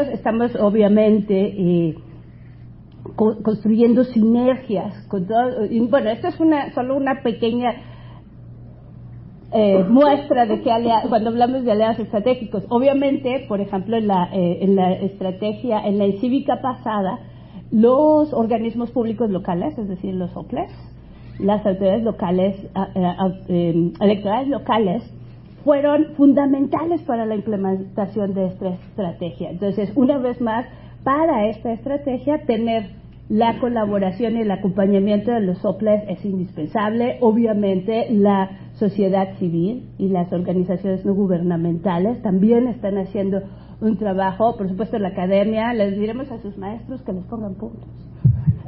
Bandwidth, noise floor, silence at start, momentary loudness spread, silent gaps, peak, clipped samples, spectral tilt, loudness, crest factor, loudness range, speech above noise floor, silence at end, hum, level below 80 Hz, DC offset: 5 kHz; -40 dBFS; 0 s; 11 LU; none; -4 dBFS; under 0.1%; -12.5 dB/octave; -19 LUFS; 14 dB; 4 LU; 22 dB; 0 s; none; -46 dBFS; under 0.1%